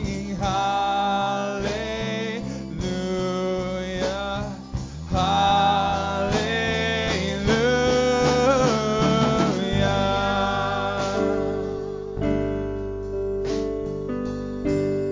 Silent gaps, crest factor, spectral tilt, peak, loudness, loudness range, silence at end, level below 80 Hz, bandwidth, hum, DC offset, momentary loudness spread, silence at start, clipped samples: none; 16 dB; -5.5 dB/octave; -8 dBFS; -23 LUFS; 6 LU; 0 s; -38 dBFS; 7.6 kHz; none; under 0.1%; 10 LU; 0 s; under 0.1%